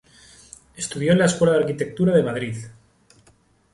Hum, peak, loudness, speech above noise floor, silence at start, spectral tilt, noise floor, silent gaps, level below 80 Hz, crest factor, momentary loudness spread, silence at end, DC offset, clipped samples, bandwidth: none; -6 dBFS; -21 LUFS; 38 dB; 0.8 s; -5.5 dB/octave; -58 dBFS; none; -54 dBFS; 18 dB; 14 LU; 1 s; under 0.1%; under 0.1%; 11.5 kHz